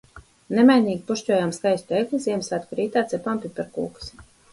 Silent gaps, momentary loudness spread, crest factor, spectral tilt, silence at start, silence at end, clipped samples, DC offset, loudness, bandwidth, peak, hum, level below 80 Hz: none; 15 LU; 18 dB; -5.5 dB/octave; 0.15 s; 0.3 s; under 0.1%; under 0.1%; -23 LUFS; 11.5 kHz; -4 dBFS; none; -56 dBFS